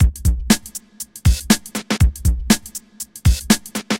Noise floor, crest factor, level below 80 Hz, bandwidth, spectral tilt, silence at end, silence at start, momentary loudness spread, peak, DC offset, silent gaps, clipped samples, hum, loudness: -35 dBFS; 18 dB; -22 dBFS; 17 kHz; -4.5 dB/octave; 0 s; 0 s; 15 LU; 0 dBFS; under 0.1%; none; under 0.1%; none; -18 LUFS